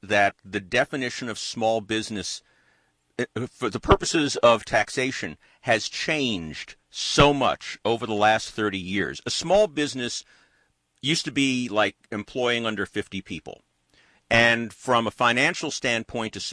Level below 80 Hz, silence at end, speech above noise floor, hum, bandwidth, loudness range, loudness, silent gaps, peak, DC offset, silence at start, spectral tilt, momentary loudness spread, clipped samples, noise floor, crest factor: -46 dBFS; 0 s; 43 dB; none; 11 kHz; 3 LU; -24 LUFS; none; -4 dBFS; under 0.1%; 0 s; -3.5 dB/octave; 14 LU; under 0.1%; -67 dBFS; 20 dB